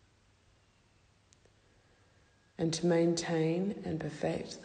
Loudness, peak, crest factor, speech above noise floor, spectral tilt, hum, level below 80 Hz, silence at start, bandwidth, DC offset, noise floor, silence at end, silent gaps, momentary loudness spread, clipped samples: -33 LUFS; -18 dBFS; 16 dB; 35 dB; -5.5 dB/octave; none; -66 dBFS; 2.6 s; 9.6 kHz; under 0.1%; -67 dBFS; 0 s; none; 9 LU; under 0.1%